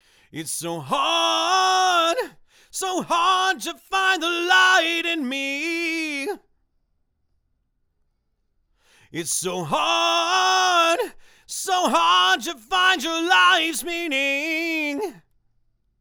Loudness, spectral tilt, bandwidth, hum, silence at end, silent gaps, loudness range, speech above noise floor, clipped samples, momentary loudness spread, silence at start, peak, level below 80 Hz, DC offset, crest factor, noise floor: -20 LUFS; -1.5 dB/octave; over 20 kHz; none; 0.8 s; none; 11 LU; 49 dB; under 0.1%; 13 LU; 0.35 s; -4 dBFS; -62 dBFS; under 0.1%; 18 dB; -70 dBFS